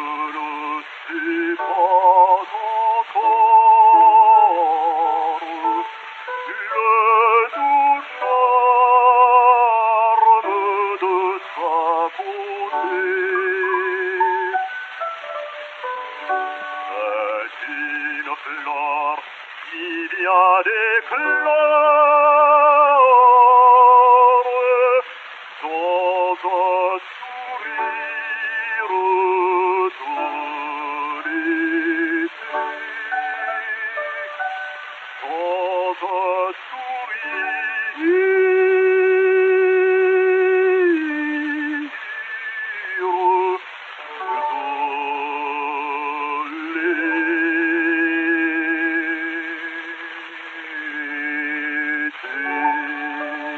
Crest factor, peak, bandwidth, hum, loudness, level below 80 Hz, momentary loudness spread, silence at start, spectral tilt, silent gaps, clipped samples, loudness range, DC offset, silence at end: 16 dB; -2 dBFS; 6.4 kHz; none; -18 LUFS; -88 dBFS; 16 LU; 0 s; -3.5 dB/octave; none; under 0.1%; 11 LU; under 0.1%; 0 s